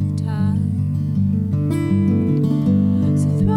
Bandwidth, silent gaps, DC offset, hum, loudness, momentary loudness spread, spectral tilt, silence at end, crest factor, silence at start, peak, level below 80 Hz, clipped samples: 11.5 kHz; none; under 0.1%; none; -19 LUFS; 4 LU; -9.5 dB/octave; 0 s; 10 dB; 0 s; -6 dBFS; -42 dBFS; under 0.1%